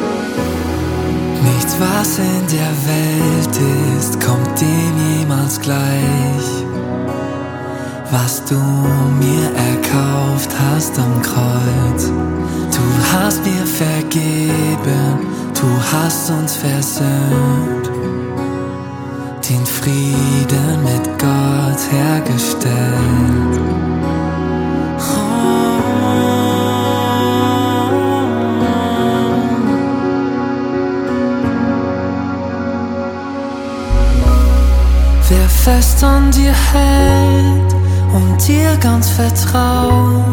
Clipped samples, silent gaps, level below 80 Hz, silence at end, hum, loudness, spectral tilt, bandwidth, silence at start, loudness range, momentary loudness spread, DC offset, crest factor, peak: under 0.1%; none; -20 dBFS; 0 s; none; -15 LUFS; -5.5 dB/octave; 18 kHz; 0 s; 6 LU; 8 LU; under 0.1%; 14 dB; 0 dBFS